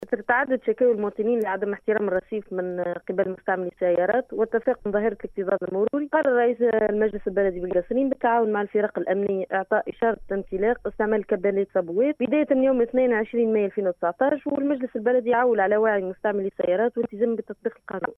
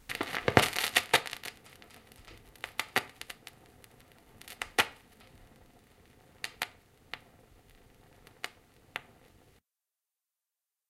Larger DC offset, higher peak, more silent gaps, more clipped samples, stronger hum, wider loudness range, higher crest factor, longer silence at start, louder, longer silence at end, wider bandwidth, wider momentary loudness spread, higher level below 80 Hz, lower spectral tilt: neither; second, -8 dBFS vs -2 dBFS; neither; neither; neither; second, 3 LU vs 17 LU; second, 16 dB vs 36 dB; about the same, 0 s vs 0.1 s; first, -24 LUFS vs -32 LUFS; second, 0.05 s vs 1.9 s; second, 3.7 kHz vs 16 kHz; second, 6 LU vs 28 LU; first, -54 dBFS vs -62 dBFS; first, -9 dB/octave vs -2.5 dB/octave